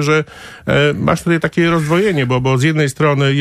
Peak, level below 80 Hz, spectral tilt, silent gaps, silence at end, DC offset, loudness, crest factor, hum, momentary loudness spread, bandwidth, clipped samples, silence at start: -2 dBFS; -42 dBFS; -6 dB/octave; none; 0 s; under 0.1%; -14 LUFS; 12 dB; none; 4 LU; 14 kHz; under 0.1%; 0 s